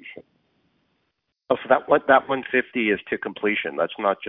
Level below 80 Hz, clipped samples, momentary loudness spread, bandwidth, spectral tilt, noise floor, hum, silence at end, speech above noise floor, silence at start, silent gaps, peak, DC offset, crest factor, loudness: -66 dBFS; under 0.1%; 9 LU; 4 kHz; -8.5 dB/octave; -75 dBFS; none; 0 s; 53 dB; 0.05 s; none; -4 dBFS; under 0.1%; 20 dB; -22 LUFS